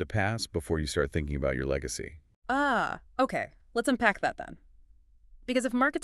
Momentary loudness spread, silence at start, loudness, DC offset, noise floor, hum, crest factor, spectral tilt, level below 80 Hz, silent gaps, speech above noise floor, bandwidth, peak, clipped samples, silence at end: 12 LU; 0 s; -30 LUFS; under 0.1%; -58 dBFS; none; 22 dB; -5 dB/octave; -44 dBFS; 2.36-2.42 s; 29 dB; 13.5 kHz; -8 dBFS; under 0.1%; 0 s